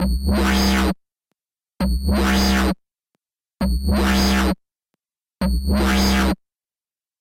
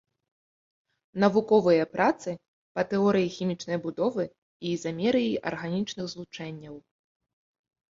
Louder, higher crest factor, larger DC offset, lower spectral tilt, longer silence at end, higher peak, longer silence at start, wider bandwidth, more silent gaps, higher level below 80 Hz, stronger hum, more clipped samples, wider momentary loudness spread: first, -19 LUFS vs -27 LUFS; second, 12 dB vs 22 dB; neither; about the same, -5 dB/octave vs -6 dB/octave; second, 0.85 s vs 1.15 s; about the same, -8 dBFS vs -8 dBFS; second, 0 s vs 1.15 s; first, 16.5 kHz vs 7.8 kHz; second, none vs 2.48-2.75 s, 4.38-4.60 s; first, -24 dBFS vs -66 dBFS; neither; neither; second, 9 LU vs 16 LU